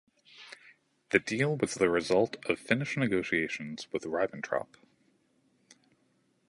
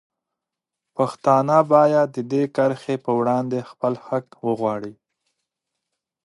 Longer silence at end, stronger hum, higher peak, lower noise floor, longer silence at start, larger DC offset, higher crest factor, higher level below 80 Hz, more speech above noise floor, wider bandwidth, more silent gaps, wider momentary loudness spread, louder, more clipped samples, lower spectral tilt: first, 1.85 s vs 1.35 s; neither; second, -6 dBFS vs -2 dBFS; second, -72 dBFS vs -85 dBFS; second, 0.35 s vs 1 s; neither; first, 26 dB vs 20 dB; first, -66 dBFS vs -72 dBFS; second, 41 dB vs 65 dB; about the same, 11.5 kHz vs 11.5 kHz; neither; first, 21 LU vs 12 LU; second, -30 LUFS vs -21 LUFS; neither; second, -5 dB/octave vs -7.5 dB/octave